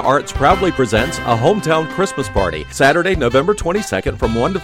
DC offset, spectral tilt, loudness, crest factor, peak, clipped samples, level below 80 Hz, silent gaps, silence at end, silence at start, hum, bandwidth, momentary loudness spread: under 0.1%; -5 dB/octave; -16 LUFS; 14 dB; -2 dBFS; under 0.1%; -30 dBFS; none; 0 s; 0 s; none; 16.5 kHz; 5 LU